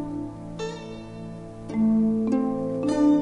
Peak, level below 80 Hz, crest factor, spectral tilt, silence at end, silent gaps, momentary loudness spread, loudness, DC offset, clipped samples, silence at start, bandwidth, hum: -10 dBFS; -50 dBFS; 14 dB; -7.5 dB/octave; 0 s; none; 17 LU; -25 LUFS; under 0.1%; under 0.1%; 0 s; 9.8 kHz; none